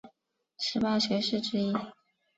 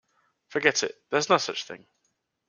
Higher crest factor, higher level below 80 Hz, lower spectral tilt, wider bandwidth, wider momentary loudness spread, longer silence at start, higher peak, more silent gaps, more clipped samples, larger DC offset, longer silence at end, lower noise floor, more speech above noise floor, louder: second, 16 dB vs 26 dB; first, -68 dBFS vs -74 dBFS; first, -5 dB/octave vs -2.5 dB/octave; second, 8 kHz vs 10 kHz; second, 8 LU vs 14 LU; second, 0.05 s vs 0.5 s; second, -16 dBFS vs -2 dBFS; neither; neither; neither; second, 0.45 s vs 0.7 s; about the same, -73 dBFS vs -76 dBFS; second, 44 dB vs 50 dB; second, -30 LUFS vs -26 LUFS